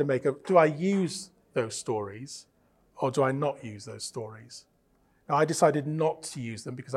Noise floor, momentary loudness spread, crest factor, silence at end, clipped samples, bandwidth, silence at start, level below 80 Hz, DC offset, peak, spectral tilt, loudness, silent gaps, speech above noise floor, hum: -67 dBFS; 19 LU; 22 dB; 0 s; under 0.1%; 14 kHz; 0 s; -72 dBFS; under 0.1%; -8 dBFS; -5.5 dB/octave; -28 LUFS; none; 39 dB; none